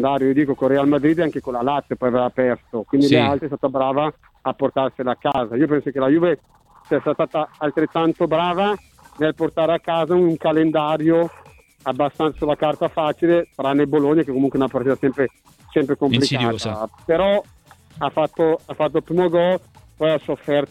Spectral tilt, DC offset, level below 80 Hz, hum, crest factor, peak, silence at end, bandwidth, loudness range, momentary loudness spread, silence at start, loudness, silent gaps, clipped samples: -7 dB/octave; under 0.1%; -52 dBFS; none; 18 dB; -2 dBFS; 0.05 s; 12 kHz; 2 LU; 6 LU; 0 s; -20 LUFS; none; under 0.1%